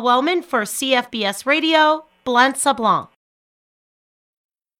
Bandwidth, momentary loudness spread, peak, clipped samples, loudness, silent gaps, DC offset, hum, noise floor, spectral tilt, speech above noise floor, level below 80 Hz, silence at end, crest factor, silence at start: 17.5 kHz; 7 LU; -2 dBFS; under 0.1%; -18 LUFS; none; under 0.1%; none; under -90 dBFS; -2.5 dB/octave; over 72 dB; -66 dBFS; 1.75 s; 18 dB; 0 s